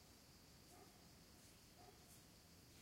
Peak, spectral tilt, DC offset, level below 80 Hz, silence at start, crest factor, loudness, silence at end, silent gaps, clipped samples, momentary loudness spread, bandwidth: -50 dBFS; -3.5 dB/octave; under 0.1%; -76 dBFS; 0 s; 16 dB; -65 LUFS; 0 s; none; under 0.1%; 1 LU; 16 kHz